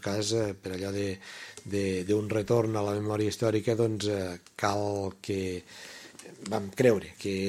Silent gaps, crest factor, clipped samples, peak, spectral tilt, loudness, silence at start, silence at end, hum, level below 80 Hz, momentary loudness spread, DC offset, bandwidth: none; 20 dB; under 0.1%; -8 dBFS; -5.5 dB/octave; -30 LUFS; 0 s; 0 s; none; -64 dBFS; 16 LU; under 0.1%; 15.5 kHz